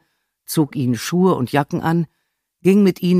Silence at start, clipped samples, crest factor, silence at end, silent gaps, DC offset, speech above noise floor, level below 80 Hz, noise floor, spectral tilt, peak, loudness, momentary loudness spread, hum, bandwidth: 0.5 s; under 0.1%; 16 dB; 0 s; none; under 0.1%; 29 dB; -60 dBFS; -46 dBFS; -6.5 dB/octave; -2 dBFS; -18 LUFS; 7 LU; none; 15.5 kHz